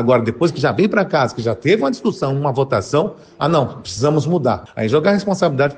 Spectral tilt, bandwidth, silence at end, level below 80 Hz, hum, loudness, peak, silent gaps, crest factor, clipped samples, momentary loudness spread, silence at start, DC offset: -6.5 dB/octave; 9.4 kHz; 0 s; -54 dBFS; none; -17 LUFS; -2 dBFS; none; 16 dB; under 0.1%; 5 LU; 0 s; under 0.1%